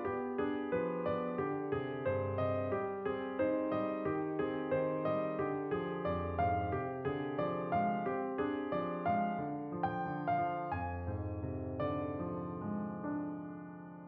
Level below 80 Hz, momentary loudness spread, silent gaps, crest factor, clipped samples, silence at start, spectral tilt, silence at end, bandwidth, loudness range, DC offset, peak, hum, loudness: -60 dBFS; 6 LU; none; 14 dB; under 0.1%; 0 s; -7 dB/octave; 0 s; 5.2 kHz; 3 LU; under 0.1%; -22 dBFS; none; -37 LUFS